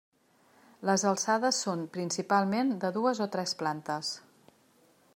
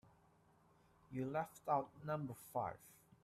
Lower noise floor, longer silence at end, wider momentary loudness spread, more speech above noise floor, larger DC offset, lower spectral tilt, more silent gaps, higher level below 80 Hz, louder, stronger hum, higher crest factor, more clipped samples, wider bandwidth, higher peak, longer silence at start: second, -65 dBFS vs -72 dBFS; first, 0.95 s vs 0.35 s; second, 8 LU vs 11 LU; first, 35 dB vs 29 dB; neither; second, -3.5 dB/octave vs -7 dB/octave; neither; about the same, -80 dBFS vs -78 dBFS; first, -30 LUFS vs -44 LUFS; neither; about the same, 20 dB vs 22 dB; neither; about the same, 16 kHz vs 15.5 kHz; first, -12 dBFS vs -24 dBFS; second, 0.8 s vs 1.1 s